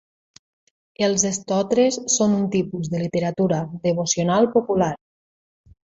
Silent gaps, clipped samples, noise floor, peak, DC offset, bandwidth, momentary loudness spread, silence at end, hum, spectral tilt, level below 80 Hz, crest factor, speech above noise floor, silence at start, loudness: none; under 0.1%; under -90 dBFS; -4 dBFS; under 0.1%; 8 kHz; 6 LU; 0.9 s; none; -4.5 dB/octave; -58 dBFS; 18 dB; over 70 dB; 1 s; -21 LUFS